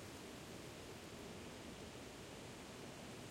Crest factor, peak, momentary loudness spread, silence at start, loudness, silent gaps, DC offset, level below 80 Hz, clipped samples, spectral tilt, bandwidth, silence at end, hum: 12 dB; -40 dBFS; 1 LU; 0 s; -53 LUFS; none; under 0.1%; -68 dBFS; under 0.1%; -4 dB/octave; 16.5 kHz; 0 s; none